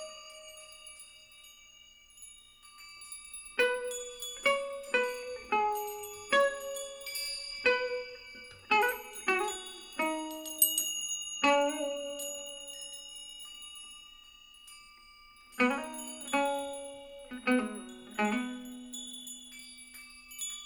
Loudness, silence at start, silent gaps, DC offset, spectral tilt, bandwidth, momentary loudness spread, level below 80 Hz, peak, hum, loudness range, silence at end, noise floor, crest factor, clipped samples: -32 LUFS; 0 s; none; under 0.1%; -1 dB/octave; over 20 kHz; 22 LU; -68 dBFS; -10 dBFS; none; 8 LU; 0 s; -58 dBFS; 26 dB; under 0.1%